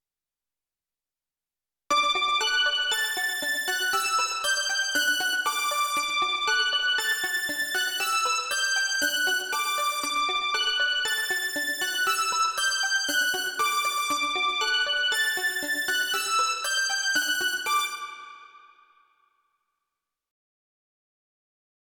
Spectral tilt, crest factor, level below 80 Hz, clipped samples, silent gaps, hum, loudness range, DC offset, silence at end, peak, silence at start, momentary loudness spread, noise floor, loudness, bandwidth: 2 dB/octave; 14 dB; -68 dBFS; under 0.1%; none; none; 3 LU; under 0.1%; 3.4 s; -12 dBFS; 1.9 s; 3 LU; under -90 dBFS; -24 LUFS; over 20 kHz